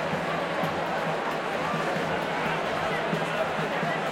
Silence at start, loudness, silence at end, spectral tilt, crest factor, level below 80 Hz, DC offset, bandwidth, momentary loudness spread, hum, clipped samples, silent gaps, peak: 0 s; -28 LUFS; 0 s; -5 dB/octave; 14 dB; -60 dBFS; under 0.1%; 16.5 kHz; 1 LU; none; under 0.1%; none; -14 dBFS